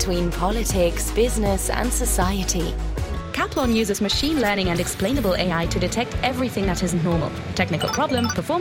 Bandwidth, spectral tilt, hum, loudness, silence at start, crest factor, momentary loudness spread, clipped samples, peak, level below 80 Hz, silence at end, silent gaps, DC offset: 16.5 kHz; -4.5 dB/octave; none; -22 LUFS; 0 s; 16 dB; 4 LU; under 0.1%; -6 dBFS; -30 dBFS; 0 s; none; under 0.1%